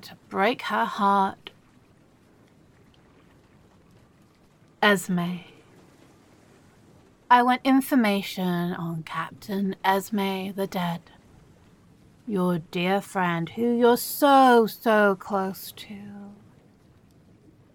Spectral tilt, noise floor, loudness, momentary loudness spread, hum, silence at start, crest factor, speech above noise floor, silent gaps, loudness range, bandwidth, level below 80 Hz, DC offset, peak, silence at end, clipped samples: -5.5 dB/octave; -58 dBFS; -23 LUFS; 17 LU; none; 0.05 s; 22 dB; 34 dB; none; 8 LU; 17.5 kHz; -66 dBFS; under 0.1%; -4 dBFS; 1.4 s; under 0.1%